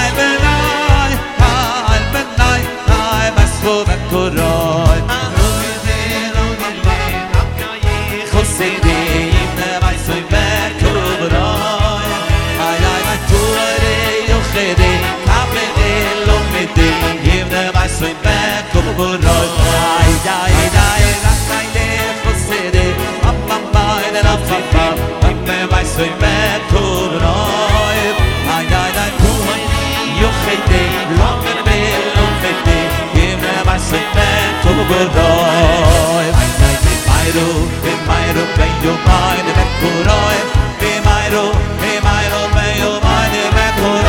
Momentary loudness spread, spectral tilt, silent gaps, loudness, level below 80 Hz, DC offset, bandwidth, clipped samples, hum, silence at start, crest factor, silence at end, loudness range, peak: 4 LU; -4.5 dB/octave; none; -13 LUFS; -18 dBFS; under 0.1%; 18 kHz; 0.3%; none; 0 s; 12 dB; 0 s; 3 LU; 0 dBFS